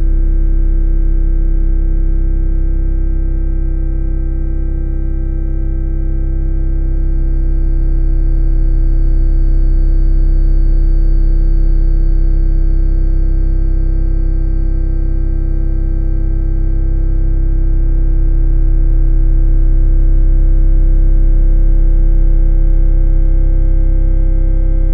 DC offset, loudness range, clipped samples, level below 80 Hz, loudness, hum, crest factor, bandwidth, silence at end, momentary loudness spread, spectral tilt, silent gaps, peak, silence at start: under 0.1%; 4 LU; under 0.1%; -10 dBFS; -17 LUFS; none; 8 dB; 1.7 kHz; 0 s; 5 LU; -12 dB/octave; none; -2 dBFS; 0 s